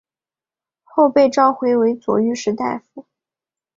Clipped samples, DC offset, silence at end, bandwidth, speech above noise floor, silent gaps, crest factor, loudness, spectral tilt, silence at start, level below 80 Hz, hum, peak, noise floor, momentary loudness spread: under 0.1%; under 0.1%; 0.75 s; 7.6 kHz; over 74 dB; none; 18 dB; -17 LUFS; -5.5 dB/octave; 0.95 s; -64 dBFS; none; -2 dBFS; under -90 dBFS; 11 LU